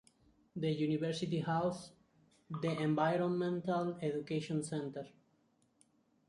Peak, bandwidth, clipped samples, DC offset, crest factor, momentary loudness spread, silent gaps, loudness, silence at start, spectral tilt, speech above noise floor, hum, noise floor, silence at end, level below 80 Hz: -20 dBFS; 11.5 kHz; under 0.1%; under 0.1%; 18 dB; 15 LU; none; -37 LUFS; 0.55 s; -6.5 dB/octave; 38 dB; none; -74 dBFS; 1.2 s; -76 dBFS